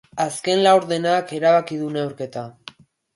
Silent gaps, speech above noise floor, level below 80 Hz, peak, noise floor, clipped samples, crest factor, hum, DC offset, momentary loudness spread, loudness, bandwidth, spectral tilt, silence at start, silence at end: none; 25 dB; -68 dBFS; -4 dBFS; -45 dBFS; under 0.1%; 16 dB; none; under 0.1%; 15 LU; -20 LUFS; 11.5 kHz; -4.5 dB/octave; 0.15 s; 0.65 s